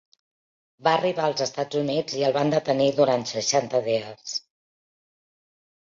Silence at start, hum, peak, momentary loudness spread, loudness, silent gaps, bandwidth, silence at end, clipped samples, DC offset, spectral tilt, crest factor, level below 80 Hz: 0.8 s; none; -6 dBFS; 7 LU; -24 LUFS; none; 7.6 kHz; 1.55 s; under 0.1%; under 0.1%; -4 dB/octave; 20 dB; -70 dBFS